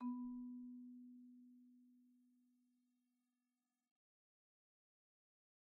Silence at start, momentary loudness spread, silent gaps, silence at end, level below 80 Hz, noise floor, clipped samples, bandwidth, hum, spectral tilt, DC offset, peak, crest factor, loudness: 0 s; 18 LU; none; 3.25 s; -90 dBFS; under -90 dBFS; under 0.1%; 1.7 kHz; none; -2 dB/octave; under 0.1%; -38 dBFS; 18 dB; -54 LUFS